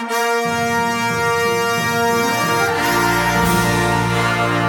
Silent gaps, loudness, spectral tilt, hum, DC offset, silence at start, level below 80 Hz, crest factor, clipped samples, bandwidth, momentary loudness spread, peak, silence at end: none; -17 LUFS; -4 dB/octave; none; under 0.1%; 0 s; -38 dBFS; 14 dB; under 0.1%; 18 kHz; 2 LU; -4 dBFS; 0 s